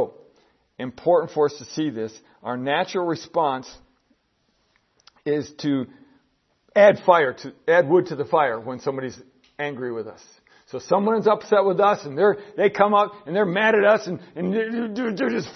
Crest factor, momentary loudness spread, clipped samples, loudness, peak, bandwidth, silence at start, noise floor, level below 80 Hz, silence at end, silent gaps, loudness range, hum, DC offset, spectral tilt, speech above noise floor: 22 dB; 15 LU; under 0.1%; -21 LUFS; 0 dBFS; 6.4 kHz; 0 s; -68 dBFS; -68 dBFS; 0.05 s; none; 8 LU; none; under 0.1%; -6 dB/octave; 47 dB